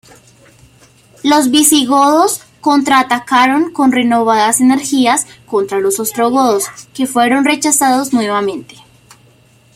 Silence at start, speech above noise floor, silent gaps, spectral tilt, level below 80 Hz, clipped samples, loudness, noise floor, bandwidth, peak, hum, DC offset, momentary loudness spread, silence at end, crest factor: 1.25 s; 36 dB; none; -2 dB/octave; -58 dBFS; under 0.1%; -12 LUFS; -48 dBFS; 16 kHz; 0 dBFS; none; under 0.1%; 8 LU; 1.1 s; 14 dB